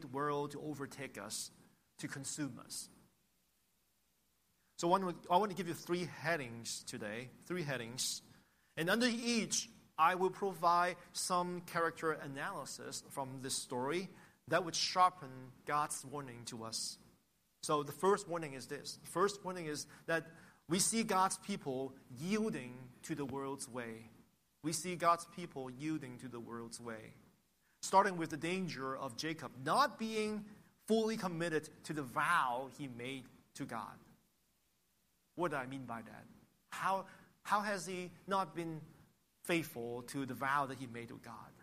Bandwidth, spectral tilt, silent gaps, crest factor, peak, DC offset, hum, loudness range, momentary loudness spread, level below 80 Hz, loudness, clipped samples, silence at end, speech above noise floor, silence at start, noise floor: 15 kHz; -3.5 dB/octave; none; 24 dB; -16 dBFS; under 0.1%; none; 8 LU; 15 LU; -78 dBFS; -38 LUFS; under 0.1%; 0 s; 40 dB; 0 s; -79 dBFS